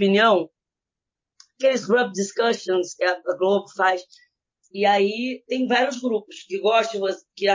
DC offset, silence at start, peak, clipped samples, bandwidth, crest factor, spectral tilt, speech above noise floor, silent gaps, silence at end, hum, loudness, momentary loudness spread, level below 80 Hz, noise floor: under 0.1%; 0 s; -6 dBFS; under 0.1%; 7.6 kHz; 16 dB; -4 dB/octave; 66 dB; none; 0 s; none; -22 LUFS; 9 LU; -82 dBFS; -87 dBFS